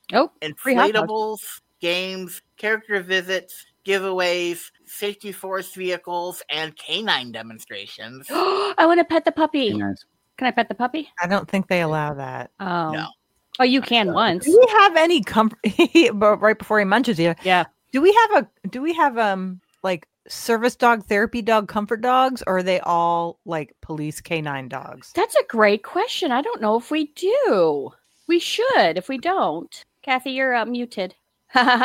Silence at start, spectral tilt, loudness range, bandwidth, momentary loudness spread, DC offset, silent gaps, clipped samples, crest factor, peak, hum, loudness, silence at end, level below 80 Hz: 0.1 s; -4.5 dB/octave; 8 LU; 17 kHz; 15 LU; under 0.1%; none; under 0.1%; 20 dB; -2 dBFS; none; -20 LUFS; 0 s; -60 dBFS